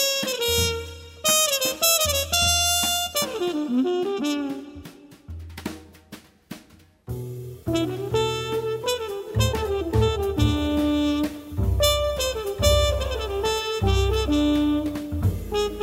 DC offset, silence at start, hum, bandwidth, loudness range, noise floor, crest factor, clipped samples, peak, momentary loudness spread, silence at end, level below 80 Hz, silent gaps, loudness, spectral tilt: under 0.1%; 0 s; none; 16 kHz; 11 LU; -53 dBFS; 20 dB; under 0.1%; -4 dBFS; 17 LU; 0 s; -34 dBFS; none; -23 LUFS; -3.5 dB/octave